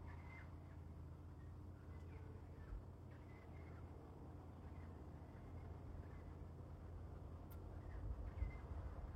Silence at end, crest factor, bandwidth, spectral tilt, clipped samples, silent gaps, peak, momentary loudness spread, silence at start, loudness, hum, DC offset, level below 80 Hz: 0 s; 20 dB; 13 kHz; -8.5 dB/octave; under 0.1%; none; -34 dBFS; 6 LU; 0 s; -56 LUFS; none; under 0.1%; -58 dBFS